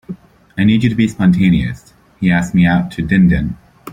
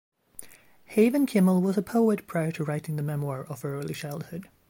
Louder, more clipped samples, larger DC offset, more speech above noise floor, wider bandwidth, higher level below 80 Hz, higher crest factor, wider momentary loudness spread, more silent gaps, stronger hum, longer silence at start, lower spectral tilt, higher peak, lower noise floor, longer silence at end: first, -14 LUFS vs -27 LUFS; neither; neither; second, 20 dB vs 25 dB; second, 9.6 kHz vs 17 kHz; first, -34 dBFS vs -68 dBFS; second, 12 dB vs 18 dB; about the same, 19 LU vs 18 LU; neither; neither; second, 0.1 s vs 0.4 s; about the same, -7.5 dB/octave vs -7.5 dB/octave; first, -2 dBFS vs -10 dBFS; second, -32 dBFS vs -51 dBFS; second, 0 s vs 0.25 s